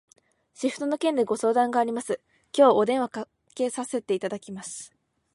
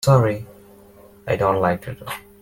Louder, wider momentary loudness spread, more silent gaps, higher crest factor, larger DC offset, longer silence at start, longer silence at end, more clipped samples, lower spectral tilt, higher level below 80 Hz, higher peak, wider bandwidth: second, -25 LUFS vs -21 LUFS; about the same, 17 LU vs 18 LU; neither; about the same, 20 dB vs 18 dB; neither; first, 0.6 s vs 0 s; first, 0.5 s vs 0.2 s; neither; second, -4 dB/octave vs -6.5 dB/octave; second, -76 dBFS vs -50 dBFS; about the same, -6 dBFS vs -4 dBFS; second, 11.5 kHz vs 17 kHz